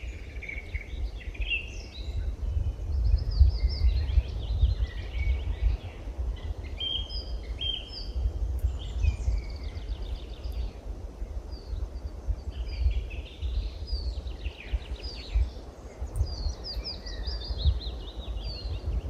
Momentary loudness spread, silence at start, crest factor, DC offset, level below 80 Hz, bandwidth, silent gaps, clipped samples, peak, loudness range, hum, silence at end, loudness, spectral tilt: 11 LU; 0 s; 22 dB; under 0.1%; -30 dBFS; 7.6 kHz; none; under 0.1%; -8 dBFS; 7 LU; none; 0 s; -33 LUFS; -5.5 dB/octave